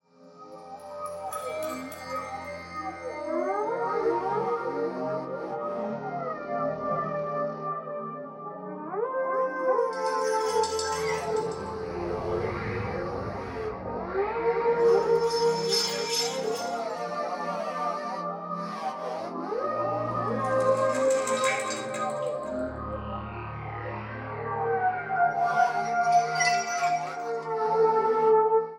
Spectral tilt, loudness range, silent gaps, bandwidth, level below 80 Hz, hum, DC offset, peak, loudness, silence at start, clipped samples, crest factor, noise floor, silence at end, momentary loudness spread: -4 dB/octave; 6 LU; none; 16 kHz; -56 dBFS; none; under 0.1%; -10 dBFS; -28 LUFS; 0.2 s; under 0.1%; 18 dB; -50 dBFS; 0 s; 12 LU